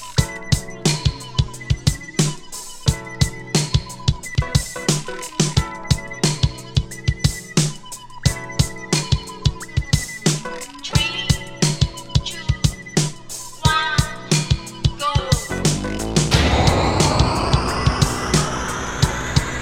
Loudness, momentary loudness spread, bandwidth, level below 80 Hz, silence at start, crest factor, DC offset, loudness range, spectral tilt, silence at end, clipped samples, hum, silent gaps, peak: -20 LUFS; 7 LU; 16.5 kHz; -28 dBFS; 0 s; 20 dB; under 0.1%; 4 LU; -4 dB/octave; 0 s; under 0.1%; none; none; 0 dBFS